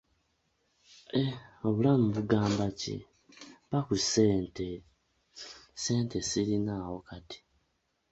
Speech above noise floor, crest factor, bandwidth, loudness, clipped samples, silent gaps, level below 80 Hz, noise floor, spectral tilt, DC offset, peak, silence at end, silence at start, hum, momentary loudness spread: 47 dB; 20 dB; 8.2 kHz; -30 LUFS; under 0.1%; none; -58 dBFS; -77 dBFS; -5.5 dB/octave; under 0.1%; -12 dBFS; 0.75 s; 1.15 s; none; 20 LU